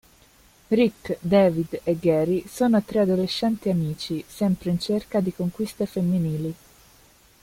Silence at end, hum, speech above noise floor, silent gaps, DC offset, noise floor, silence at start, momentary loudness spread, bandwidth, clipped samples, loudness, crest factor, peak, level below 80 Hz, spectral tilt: 0.9 s; none; 32 dB; none; under 0.1%; -55 dBFS; 0.7 s; 8 LU; 16.5 kHz; under 0.1%; -24 LUFS; 18 dB; -6 dBFS; -54 dBFS; -7 dB/octave